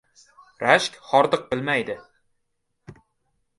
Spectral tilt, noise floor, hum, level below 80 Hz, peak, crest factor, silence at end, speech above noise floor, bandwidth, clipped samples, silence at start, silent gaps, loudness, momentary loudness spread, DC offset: -4 dB/octave; -74 dBFS; none; -64 dBFS; -2 dBFS; 24 dB; 0.65 s; 52 dB; 11.5 kHz; under 0.1%; 0.6 s; none; -22 LUFS; 10 LU; under 0.1%